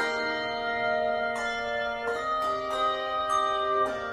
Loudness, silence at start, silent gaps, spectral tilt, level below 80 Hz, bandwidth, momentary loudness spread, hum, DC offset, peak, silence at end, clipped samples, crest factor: -28 LUFS; 0 s; none; -3 dB/octave; -58 dBFS; 15 kHz; 4 LU; none; under 0.1%; -16 dBFS; 0 s; under 0.1%; 12 dB